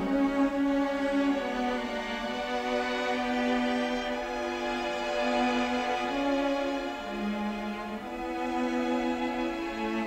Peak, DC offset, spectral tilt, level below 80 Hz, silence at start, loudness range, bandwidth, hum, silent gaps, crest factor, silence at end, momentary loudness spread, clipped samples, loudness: -16 dBFS; under 0.1%; -4.5 dB/octave; -54 dBFS; 0 s; 2 LU; 15.5 kHz; none; none; 14 dB; 0 s; 6 LU; under 0.1%; -30 LUFS